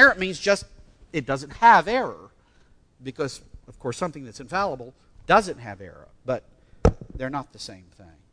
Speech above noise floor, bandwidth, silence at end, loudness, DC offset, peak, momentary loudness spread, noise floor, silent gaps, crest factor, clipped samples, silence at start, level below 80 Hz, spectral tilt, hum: 33 dB; 11 kHz; 0.55 s; -23 LUFS; under 0.1%; -2 dBFS; 23 LU; -57 dBFS; none; 24 dB; under 0.1%; 0 s; -40 dBFS; -4.5 dB/octave; none